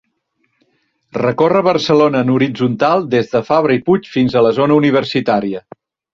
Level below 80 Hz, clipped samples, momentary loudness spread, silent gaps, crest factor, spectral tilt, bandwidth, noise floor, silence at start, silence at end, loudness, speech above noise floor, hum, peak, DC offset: -52 dBFS; under 0.1%; 6 LU; none; 14 dB; -7 dB/octave; 7.4 kHz; -66 dBFS; 1.15 s; 0.55 s; -14 LUFS; 52 dB; none; -2 dBFS; under 0.1%